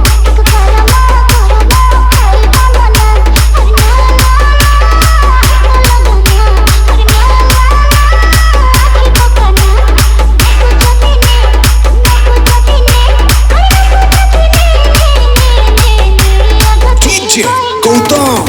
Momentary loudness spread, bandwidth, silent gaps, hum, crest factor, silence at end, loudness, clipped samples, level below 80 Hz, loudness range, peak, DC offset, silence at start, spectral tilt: 1 LU; 18.5 kHz; none; none; 4 dB; 0 s; -7 LUFS; 1%; -6 dBFS; 0 LU; 0 dBFS; under 0.1%; 0 s; -4 dB/octave